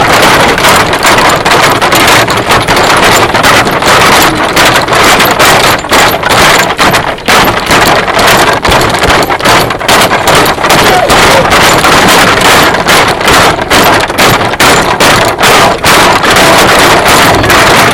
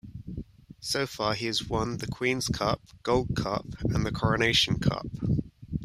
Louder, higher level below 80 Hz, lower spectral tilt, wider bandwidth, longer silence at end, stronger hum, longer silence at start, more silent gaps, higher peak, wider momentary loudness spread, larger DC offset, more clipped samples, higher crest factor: first, -4 LUFS vs -28 LUFS; first, -24 dBFS vs -44 dBFS; second, -2.5 dB/octave vs -4.5 dB/octave; first, over 20 kHz vs 15 kHz; about the same, 0 s vs 0 s; neither; about the same, 0 s vs 0.05 s; neither; first, 0 dBFS vs -10 dBFS; second, 3 LU vs 16 LU; neither; first, 8% vs under 0.1%; second, 4 dB vs 20 dB